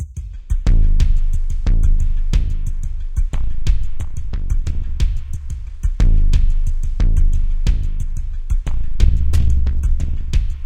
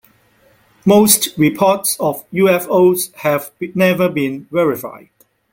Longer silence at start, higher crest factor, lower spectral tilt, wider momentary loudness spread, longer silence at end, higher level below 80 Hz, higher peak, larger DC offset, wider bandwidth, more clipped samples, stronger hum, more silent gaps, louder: second, 0 s vs 0.85 s; about the same, 14 dB vs 16 dB; first, -6.5 dB/octave vs -4.5 dB/octave; about the same, 10 LU vs 9 LU; second, 0 s vs 0.55 s; first, -14 dBFS vs -56 dBFS; about the same, 0 dBFS vs 0 dBFS; neither; second, 8 kHz vs 17 kHz; neither; neither; neither; second, -22 LUFS vs -15 LUFS